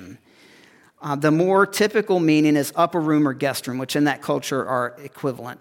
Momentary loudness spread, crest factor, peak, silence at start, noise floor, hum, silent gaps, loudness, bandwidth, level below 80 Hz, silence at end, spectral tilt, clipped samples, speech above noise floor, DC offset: 11 LU; 16 dB; -4 dBFS; 0 s; -52 dBFS; none; none; -21 LUFS; 17 kHz; -70 dBFS; 0.05 s; -5.5 dB/octave; under 0.1%; 32 dB; under 0.1%